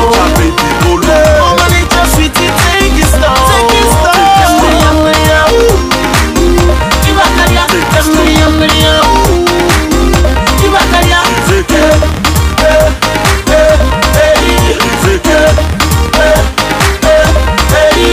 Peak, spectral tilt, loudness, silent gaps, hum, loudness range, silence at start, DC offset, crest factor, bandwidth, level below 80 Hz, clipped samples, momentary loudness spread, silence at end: 0 dBFS; -4.5 dB/octave; -7 LUFS; none; none; 1 LU; 0 s; under 0.1%; 6 dB; 16.5 kHz; -14 dBFS; 0.4%; 3 LU; 0 s